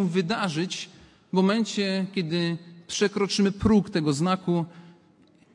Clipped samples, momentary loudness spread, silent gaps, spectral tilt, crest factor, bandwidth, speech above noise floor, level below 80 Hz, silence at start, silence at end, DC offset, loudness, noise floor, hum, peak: under 0.1%; 10 LU; none; -5.5 dB/octave; 18 dB; 11.5 kHz; 33 dB; -52 dBFS; 0 s; 0.65 s; under 0.1%; -25 LUFS; -58 dBFS; none; -8 dBFS